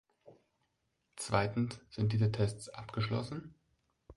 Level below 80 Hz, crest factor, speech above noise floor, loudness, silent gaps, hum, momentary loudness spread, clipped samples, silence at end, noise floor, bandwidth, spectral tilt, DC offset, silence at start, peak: -60 dBFS; 22 dB; 47 dB; -36 LUFS; none; none; 13 LU; under 0.1%; 0.05 s; -81 dBFS; 11.5 kHz; -6 dB/octave; under 0.1%; 0.25 s; -14 dBFS